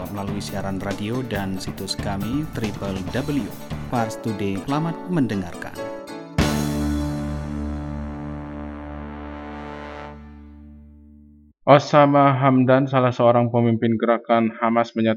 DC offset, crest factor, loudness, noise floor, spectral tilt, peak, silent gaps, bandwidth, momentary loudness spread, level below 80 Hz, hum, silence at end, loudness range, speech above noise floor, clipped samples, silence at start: under 0.1%; 22 dB; -22 LUFS; -50 dBFS; -6.5 dB/octave; 0 dBFS; none; 18 kHz; 18 LU; -40 dBFS; none; 0 s; 15 LU; 30 dB; under 0.1%; 0 s